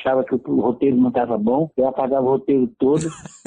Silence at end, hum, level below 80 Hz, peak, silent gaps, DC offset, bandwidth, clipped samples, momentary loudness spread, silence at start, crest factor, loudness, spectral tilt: 0.25 s; none; -56 dBFS; -8 dBFS; none; under 0.1%; 10 kHz; under 0.1%; 3 LU; 0 s; 12 dB; -19 LUFS; -7.5 dB/octave